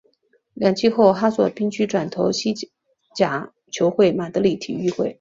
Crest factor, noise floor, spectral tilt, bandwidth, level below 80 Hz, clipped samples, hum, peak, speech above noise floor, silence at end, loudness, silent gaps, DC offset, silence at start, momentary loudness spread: 18 dB; -63 dBFS; -5.5 dB/octave; 7.8 kHz; -60 dBFS; under 0.1%; none; -2 dBFS; 44 dB; 0.1 s; -20 LUFS; none; under 0.1%; 0.55 s; 11 LU